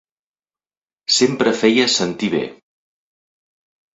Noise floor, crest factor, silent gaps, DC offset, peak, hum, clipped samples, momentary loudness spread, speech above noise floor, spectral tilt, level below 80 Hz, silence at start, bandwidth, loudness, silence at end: under -90 dBFS; 20 dB; none; under 0.1%; -2 dBFS; none; under 0.1%; 11 LU; over 73 dB; -3 dB/octave; -62 dBFS; 1.1 s; 8.4 kHz; -16 LUFS; 1.4 s